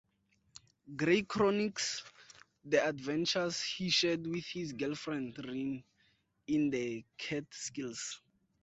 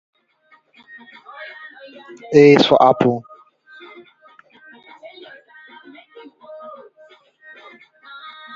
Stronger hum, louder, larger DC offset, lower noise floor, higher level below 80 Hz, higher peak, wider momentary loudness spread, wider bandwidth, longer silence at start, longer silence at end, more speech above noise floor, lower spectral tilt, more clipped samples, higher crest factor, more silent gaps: neither; second, -35 LUFS vs -13 LUFS; neither; first, -75 dBFS vs -56 dBFS; second, -70 dBFS vs -62 dBFS; second, -16 dBFS vs 0 dBFS; second, 12 LU vs 30 LU; first, 8.4 kHz vs 7.6 kHz; second, 0.85 s vs 1.4 s; second, 0.45 s vs 1.85 s; second, 40 dB vs 44 dB; second, -4 dB/octave vs -6.5 dB/octave; neither; about the same, 20 dB vs 20 dB; neither